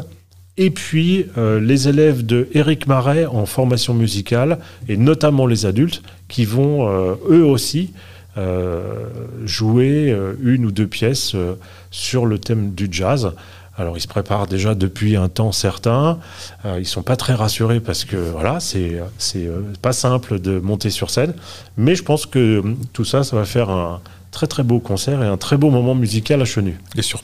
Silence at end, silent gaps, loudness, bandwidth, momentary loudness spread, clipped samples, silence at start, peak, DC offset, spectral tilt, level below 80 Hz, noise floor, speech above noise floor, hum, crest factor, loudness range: 0 s; none; -18 LUFS; 16 kHz; 11 LU; under 0.1%; 0 s; -2 dBFS; 0.8%; -6 dB/octave; -46 dBFS; -44 dBFS; 27 dB; none; 16 dB; 4 LU